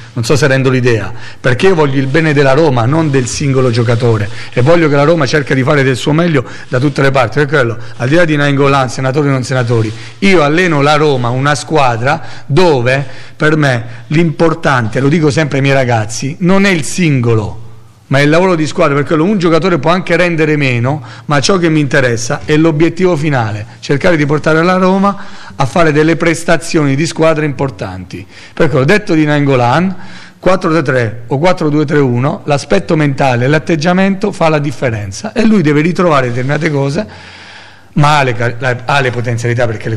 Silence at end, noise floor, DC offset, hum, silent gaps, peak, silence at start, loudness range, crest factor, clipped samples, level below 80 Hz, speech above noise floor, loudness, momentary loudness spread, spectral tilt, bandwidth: 0 s; -35 dBFS; under 0.1%; none; none; 0 dBFS; 0 s; 2 LU; 10 dB; under 0.1%; -38 dBFS; 25 dB; -11 LUFS; 7 LU; -6 dB/octave; 12 kHz